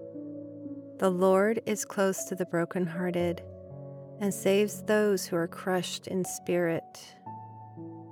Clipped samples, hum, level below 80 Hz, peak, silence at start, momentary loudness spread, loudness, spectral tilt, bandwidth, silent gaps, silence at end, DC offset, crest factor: under 0.1%; none; -80 dBFS; -12 dBFS; 0 s; 19 LU; -29 LUFS; -5 dB/octave; 18.5 kHz; none; 0 s; under 0.1%; 18 dB